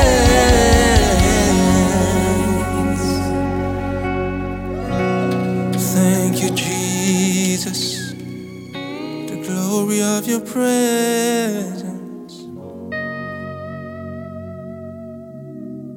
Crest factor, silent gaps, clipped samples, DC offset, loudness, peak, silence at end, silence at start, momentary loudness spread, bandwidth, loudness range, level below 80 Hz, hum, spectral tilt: 18 dB; none; under 0.1%; under 0.1%; -18 LUFS; 0 dBFS; 0 s; 0 s; 19 LU; 19 kHz; 13 LU; -28 dBFS; none; -4.5 dB/octave